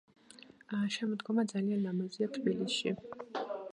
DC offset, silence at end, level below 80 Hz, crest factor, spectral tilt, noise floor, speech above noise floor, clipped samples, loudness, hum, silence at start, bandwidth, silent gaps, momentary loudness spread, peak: under 0.1%; 0 s; -80 dBFS; 16 dB; -5.5 dB/octave; -58 dBFS; 23 dB; under 0.1%; -35 LUFS; none; 0.35 s; 10.5 kHz; none; 9 LU; -18 dBFS